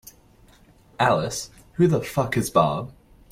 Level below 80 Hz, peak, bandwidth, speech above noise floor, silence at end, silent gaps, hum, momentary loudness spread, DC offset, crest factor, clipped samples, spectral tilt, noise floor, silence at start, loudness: -52 dBFS; -6 dBFS; 16.5 kHz; 32 dB; 0.4 s; none; none; 12 LU; under 0.1%; 18 dB; under 0.1%; -5.5 dB/octave; -54 dBFS; 1 s; -23 LUFS